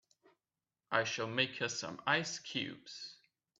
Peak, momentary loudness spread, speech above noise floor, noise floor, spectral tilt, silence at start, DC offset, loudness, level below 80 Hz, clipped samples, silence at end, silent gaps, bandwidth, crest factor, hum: -14 dBFS; 14 LU; over 52 dB; under -90 dBFS; -2.5 dB/octave; 0.9 s; under 0.1%; -36 LUFS; -80 dBFS; under 0.1%; 0.45 s; none; 8.4 kHz; 26 dB; none